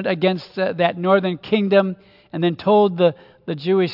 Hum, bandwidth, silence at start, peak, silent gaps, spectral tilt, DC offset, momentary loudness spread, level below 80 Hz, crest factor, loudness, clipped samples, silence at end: none; 5.8 kHz; 0 s; -2 dBFS; none; -9 dB/octave; under 0.1%; 12 LU; -66 dBFS; 16 dB; -19 LUFS; under 0.1%; 0 s